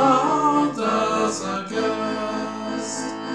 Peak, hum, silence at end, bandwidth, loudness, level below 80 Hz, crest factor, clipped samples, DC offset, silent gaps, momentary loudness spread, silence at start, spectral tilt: -6 dBFS; none; 0 s; 11 kHz; -22 LUFS; -62 dBFS; 16 dB; under 0.1%; 0.2%; none; 9 LU; 0 s; -4 dB/octave